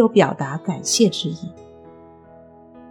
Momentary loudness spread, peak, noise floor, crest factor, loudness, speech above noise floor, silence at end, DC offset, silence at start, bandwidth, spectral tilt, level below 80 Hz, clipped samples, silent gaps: 15 LU; -2 dBFS; -46 dBFS; 20 dB; -20 LUFS; 27 dB; 0.05 s; under 0.1%; 0 s; 17.5 kHz; -4.5 dB/octave; -62 dBFS; under 0.1%; none